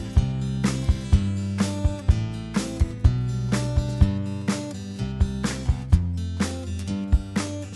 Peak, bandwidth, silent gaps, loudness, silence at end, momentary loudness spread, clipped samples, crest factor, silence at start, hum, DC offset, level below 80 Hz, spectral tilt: -4 dBFS; 12 kHz; none; -25 LUFS; 0 s; 6 LU; under 0.1%; 18 dB; 0 s; none; under 0.1%; -28 dBFS; -6.5 dB/octave